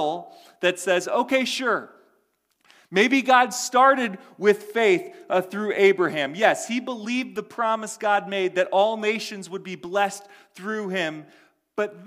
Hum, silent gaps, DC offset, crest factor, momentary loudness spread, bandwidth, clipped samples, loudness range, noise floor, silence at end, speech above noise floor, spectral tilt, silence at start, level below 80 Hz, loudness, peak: none; none; under 0.1%; 20 dB; 12 LU; 16 kHz; under 0.1%; 5 LU; -69 dBFS; 0 s; 46 dB; -3.5 dB/octave; 0 s; -76 dBFS; -23 LUFS; -4 dBFS